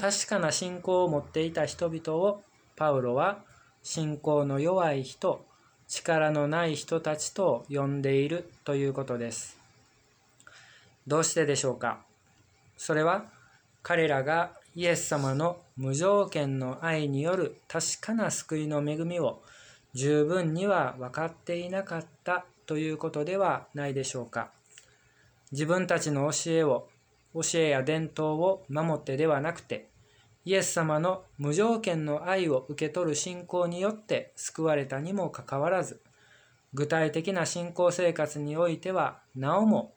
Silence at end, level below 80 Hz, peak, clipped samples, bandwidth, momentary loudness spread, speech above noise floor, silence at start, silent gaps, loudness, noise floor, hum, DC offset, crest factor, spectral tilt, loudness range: 0.1 s; -70 dBFS; -12 dBFS; under 0.1%; over 20 kHz; 9 LU; 36 dB; 0 s; none; -29 LUFS; -65 dBFS; none; under 0.1%; 18 dB; -4.5 dB/octave; 4 LU